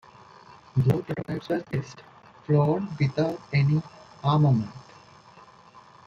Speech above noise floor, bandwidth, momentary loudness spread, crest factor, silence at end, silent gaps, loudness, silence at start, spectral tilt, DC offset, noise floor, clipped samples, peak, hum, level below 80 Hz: 27 dB; 6.8 kHz; 15 LU; 18 dB; 1.25 s; none; -26 LUFS; 0.5 s; -8.5 dB/octave; under 0.1%; -52 dBFS; under 0.1%; -10 dBFS; none; -58 dBFS